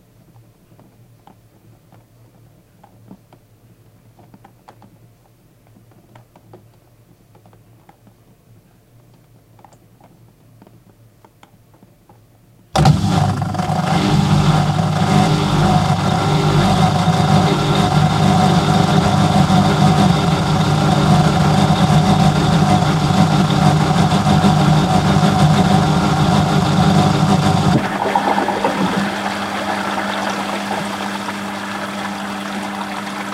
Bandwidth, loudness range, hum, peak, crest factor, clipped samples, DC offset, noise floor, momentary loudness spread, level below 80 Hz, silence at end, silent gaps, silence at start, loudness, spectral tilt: 14 kHz; 7 LU; none; 0 dBFS; 16 dB; under 0.1%; under 0.1%; -51 dBFS; 10 LU; -36 dBFS; 0 s; none; 3.1 s; -15 LUFS; -6 dB/octave